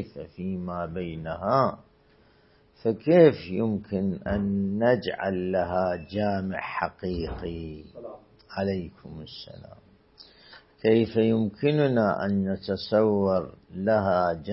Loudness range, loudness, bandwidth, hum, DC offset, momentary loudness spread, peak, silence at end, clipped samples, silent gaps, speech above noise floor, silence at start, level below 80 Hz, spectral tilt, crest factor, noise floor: 10 LU; -26 LUFS; 5.8 kHz; none; under 0.1%; 17 LU; -4 dBFS; 0 s; under 0.1%; none; 34 dB; 0 s; -52 dBFS; -11 dB/octave; 22 dB; -60 dBFS